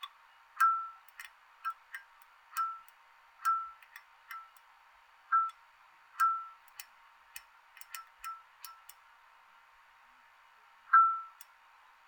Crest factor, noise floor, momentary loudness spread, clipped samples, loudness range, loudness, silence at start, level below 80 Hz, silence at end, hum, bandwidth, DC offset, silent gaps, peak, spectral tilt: 24 dB; -62 dBFS; 25 LU; under 0.1%; 17 LU; -32 LUFS; 0 s; -86 dBFS; 0.8 s; none; over 20 kHz; under 0.1%; none; -12 dBFS; 3.5 dB/octave